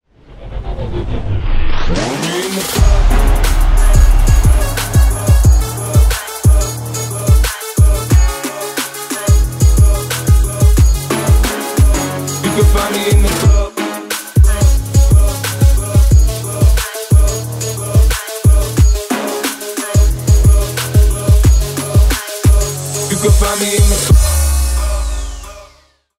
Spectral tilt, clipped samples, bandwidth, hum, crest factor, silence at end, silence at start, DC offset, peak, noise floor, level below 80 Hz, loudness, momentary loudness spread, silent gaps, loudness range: -5 dB/octave; under 0.1%; 16.5 kHz; none; 10 dB; 0.55 s; 0.3 s; under 0.1%; 0 dBFS; -49 dBFS; -12 dBFS; -13 LUFS; 9 LU; none; 2 LU